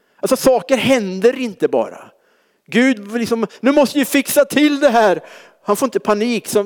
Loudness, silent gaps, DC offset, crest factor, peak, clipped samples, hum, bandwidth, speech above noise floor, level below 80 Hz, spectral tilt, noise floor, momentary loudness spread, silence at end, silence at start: -16 LUFS; none; under 0.1%; 14 dB; -2 dBFS; under 0.1%; none; over 20 kHz; 43 dB; -56 dBFS; -4 dB/octave; -59 dBFS; 7 LU; 0 s; 0.25 s